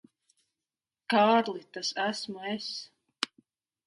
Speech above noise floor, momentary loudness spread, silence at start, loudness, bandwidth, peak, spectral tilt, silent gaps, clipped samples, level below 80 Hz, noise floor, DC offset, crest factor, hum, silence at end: over 61 dB; 16 LU; 1.1 s; -30 LUFS; 11.5 kHz; -8 dBFS; -3.5 dB/octave; none; under 0.1%; -82 dBFS; under -90 dBFS; under 0.1%; 24 dB; none; 0.6 s